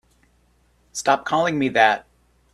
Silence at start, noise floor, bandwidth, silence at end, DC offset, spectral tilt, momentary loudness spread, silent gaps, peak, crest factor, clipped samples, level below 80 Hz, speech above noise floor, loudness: 0.95 s; -61 dBFS; 14 kHz; 0.55 s; under 0.1%; -4 dB/octave; 10 LU; none; 0 dBFS; 22 dB; under 0.1%; -60 dBFS; 42 dB; -20 LUFS